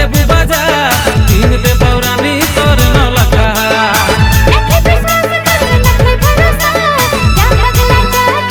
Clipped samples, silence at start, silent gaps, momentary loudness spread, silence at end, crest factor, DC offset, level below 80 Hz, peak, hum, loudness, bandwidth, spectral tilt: 1%; 0 s; none; 2 LU; 0 s; 8 dB; under 0.1%; -14 dBFS; 0 dBFS; none; -9 LUFS; over 20 kHz; -4.5 dB/octave